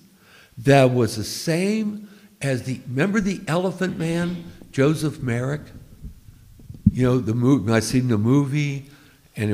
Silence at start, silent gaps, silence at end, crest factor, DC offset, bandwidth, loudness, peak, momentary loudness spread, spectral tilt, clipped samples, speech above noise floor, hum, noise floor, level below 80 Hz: 0.55 s; none; 0 s; 20 dB; under 0.1%; 16 kHz; -22 LUFS; -2 dBFS; 11 LU; -6.5 dB/octave; under 0.1%; 31 dB; none; -52 dBFS; -46 dBFS